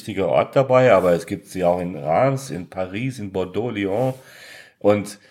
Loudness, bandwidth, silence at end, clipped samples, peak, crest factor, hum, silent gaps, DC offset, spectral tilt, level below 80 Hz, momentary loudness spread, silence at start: -20 LUFS; 15.5 kHz; 0.15 s; under 0.1%; -2 dBFS; 18 dB; none; none; under 0.1%; -6.5 dB/octave; -58 dBFS; 14 LU; 0 s